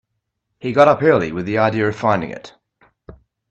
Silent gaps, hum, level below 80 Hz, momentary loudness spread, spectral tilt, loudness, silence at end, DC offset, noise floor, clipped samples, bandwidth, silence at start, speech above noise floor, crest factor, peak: none; none; -54 dBFS; 17 LU; -7 dB/octave; -16 LUFS; 0.4 s; under 0.1%; -75 dBFS; under 0.1%; 8.2 kHz; 0.65 s; 58 dB; 18 dB; 0 dBFS